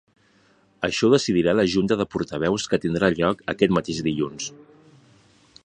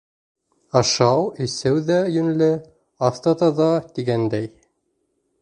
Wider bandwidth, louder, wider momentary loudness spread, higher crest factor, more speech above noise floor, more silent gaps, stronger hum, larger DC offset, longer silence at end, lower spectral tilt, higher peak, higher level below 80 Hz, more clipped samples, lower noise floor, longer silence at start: about the same, 10 kHz vs 11 kHz; about the same, -22 LUFS vs -20 LUFS; about the same, 8 LU vs 7 LU; about the same, 22 dB vs 20 dB; second, 38 dB vs 52 dB; neither; neither; neither; first, 1.1 s vs 0.95 s; about the same, -5 dB/octave vs -5.5 dB/octave; about the same, -2 dBFS vs -2 dBFS; about the same, -52 dBFS vs -56 dBFS; neither; second, -59 dBFS vs -71 dBFS; about the same, 0.8 s vs 0.75 s